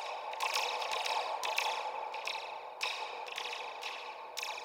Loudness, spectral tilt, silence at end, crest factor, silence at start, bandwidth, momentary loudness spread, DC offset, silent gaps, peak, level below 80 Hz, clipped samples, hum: -37 LUFS; 2 dB/octave; 0 s; 22 dB; 0 s; 17 kHz; 8 LU; under 0.1%; none; -16 dBFS; -86 dBFS; under 0.1%; none